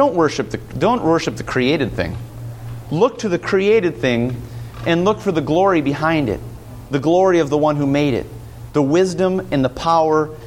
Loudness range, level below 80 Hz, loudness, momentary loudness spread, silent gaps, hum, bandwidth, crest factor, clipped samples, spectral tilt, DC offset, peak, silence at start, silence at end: 2 LU; -42 dBFS; -18 LUFS; 15 LU; none; none; 16.5 kHz; 14 dB; under 0.1%; -6.5 dB/octave; under 0.1%; -2 dBFS; 0 s; 0 s